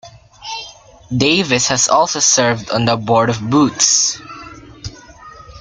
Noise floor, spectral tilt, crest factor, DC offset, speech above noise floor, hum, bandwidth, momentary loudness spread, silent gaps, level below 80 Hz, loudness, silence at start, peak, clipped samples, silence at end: -38 dBFS; -3 dB/octave; 16 dB; under 0.1%; 24 dB; none; 11 kHz; 21 LU; none; -46 dBFS; -13 LUFS; 0.05 s; 0 dBFS; under 0.1%; 0 s